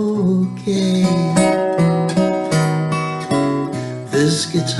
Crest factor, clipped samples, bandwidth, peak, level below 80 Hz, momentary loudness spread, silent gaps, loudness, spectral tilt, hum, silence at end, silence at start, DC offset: 14 dB; under 0.1%; 12 kHz; -2 dBFS; -52 dBFS; 6 LU; none; -17 LUFS; -6 dB/octave; none; 0 s; 0 s; under 0.1%